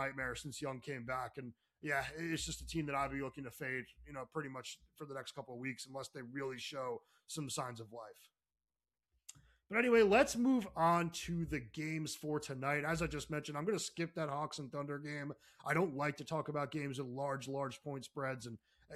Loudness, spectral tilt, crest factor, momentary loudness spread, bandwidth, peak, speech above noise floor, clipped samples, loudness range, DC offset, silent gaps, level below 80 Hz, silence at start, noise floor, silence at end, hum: -39 LUFS; -5 dB/octave; 22 dB; 16 LU; 15 kHz; -16 dBFS; over 51 dB; under 0.1%; 11 LU; under 0.1%; none; -62 dBFS; 0 s; under -90 dBFS; 0 s; none